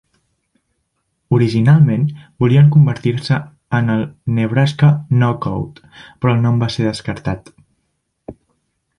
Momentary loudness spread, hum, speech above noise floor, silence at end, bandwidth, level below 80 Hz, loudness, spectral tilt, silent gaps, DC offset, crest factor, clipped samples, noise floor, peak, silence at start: 12 LU; none; 55 dB; 0.65 s; 10.5 kHz; -46 dBFS; -15 LUFS; -8 dB/octave; none; under 0.1%; 14 dB; under 0.1%; -69 dBFS; -2 dBFS; 1.3 s